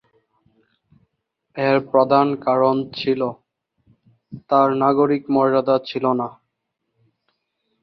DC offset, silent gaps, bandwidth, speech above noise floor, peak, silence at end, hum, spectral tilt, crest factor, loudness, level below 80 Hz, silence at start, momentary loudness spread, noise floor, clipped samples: under 0.1%; none; 6 kHz; 58 dB; -2 dBFS; 1.5 s; none; -8.5 dB/octave; 20 dB; -19 LUFS; -64 dBFS; 1.55 s; 7 LU; -77 dBFS; under 0.1%